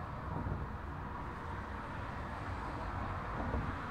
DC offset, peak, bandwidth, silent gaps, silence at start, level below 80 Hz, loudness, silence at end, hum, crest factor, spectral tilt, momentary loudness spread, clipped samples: under 0.1%; -24 dBFS; 11 kHz; none; 0 s; -48 dBFS; -42 LUFS; 0 s; none; 16 dB; -7.5 dB/octave; 5 LU; under 0.1%